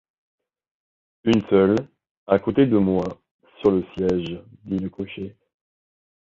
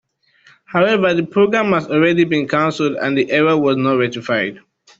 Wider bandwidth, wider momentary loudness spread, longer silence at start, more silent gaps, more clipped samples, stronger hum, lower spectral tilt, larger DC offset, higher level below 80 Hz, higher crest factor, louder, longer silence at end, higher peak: about the same, 7.6 kHz vs 7.8 kHz; first, 14 LU vs 5 LU; first, 1.25 s vs 0.7 s; first, 2.11-2.26 s, 3.31-3.39 s vs none; neither; neither; first, -8 dB/octave vs -6.5 dB/octave; neither; first, -52 dBFS vs -58 dBFS; about the same, 20 dB vs 16 dB; second, -22 LUFS vs -16 LUFS; first, 1 s vs 0.4 s; about the same, -4 dBFS vs -2 dBFS